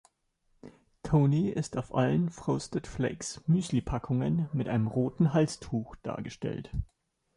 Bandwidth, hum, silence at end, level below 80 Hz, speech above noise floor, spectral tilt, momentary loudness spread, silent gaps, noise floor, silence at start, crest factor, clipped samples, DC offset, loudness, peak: 11.5 kHz; none; 0.5 s; -50 dBFS; 44 dB; -7 dB/octave; 12 LU; none; -73 dBFS; 0.65 s; 16 dB; under 0.1%; under 0.1%; -30 LUFS; -14 dBFS